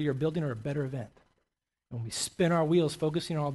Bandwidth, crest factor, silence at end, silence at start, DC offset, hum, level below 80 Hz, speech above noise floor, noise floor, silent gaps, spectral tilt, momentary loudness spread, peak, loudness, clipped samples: 12.5 kHz; 16 dB; 0 s; 0 s; under 0.1%; none; -62 dBFS; 53 dB; -83 dBFS; none; -5.5 dB/octave; 15 LU; -16 dBFS; -30 LUFS; under 0.1%